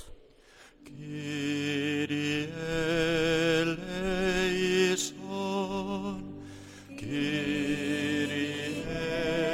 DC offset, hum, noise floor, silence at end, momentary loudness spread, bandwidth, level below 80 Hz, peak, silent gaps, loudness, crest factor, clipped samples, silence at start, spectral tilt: under 0.1%; none; -56 dBFS; 0 s; 15 LU; 16.5 kHz; -50 dBFS; -14 dBFS; none; -30 LUFS; 16 dB; under 0.1%; 0 s; -4.5 dB/octave